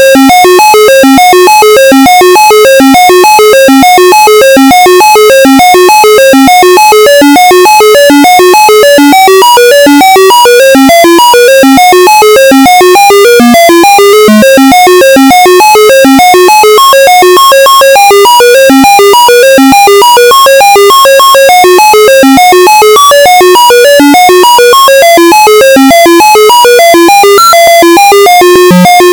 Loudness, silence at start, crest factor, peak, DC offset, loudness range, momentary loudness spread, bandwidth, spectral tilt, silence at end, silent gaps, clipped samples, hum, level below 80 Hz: 0 LUFS; 0 s; 0 dB; 0 dBFS; 0.1%; 0 LU; 0 LU; over 20 kHz; -2.5 dB/octave; 0 s; none; 50%; none; -38 dBFS